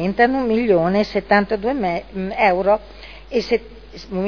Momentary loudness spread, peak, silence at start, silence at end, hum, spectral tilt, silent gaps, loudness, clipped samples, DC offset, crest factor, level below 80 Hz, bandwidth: 14 LU; -2 dBFS; 0 s; 0 s; none; -7 dB/octave; none; -19 LUFS; under 0.1%; 0.4%; 18 dB; -42 dBFS; 5.4 kHz